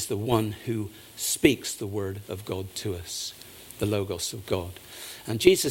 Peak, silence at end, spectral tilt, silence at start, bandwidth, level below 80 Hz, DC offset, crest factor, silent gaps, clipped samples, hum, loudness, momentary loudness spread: -2 dBFS; 0 s; -4.5 dB/octave; 0 s; 17 kHz; -52 dBFS; under 0.1%; 26 dB; none; under 0.1%; none; -28 LUFS; 16 LU